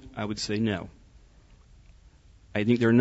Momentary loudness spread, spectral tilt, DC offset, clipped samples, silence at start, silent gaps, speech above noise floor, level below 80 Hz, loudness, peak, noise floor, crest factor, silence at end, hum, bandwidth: 12 LU; -6 dB/octave; under 0.1%; under 0.1%; 0 s; none; 30 dB; -54 dBFS; -28 LUFS; -10 dBFS; -55 dBFS; 18 dB; 0 s; none; 8 kHz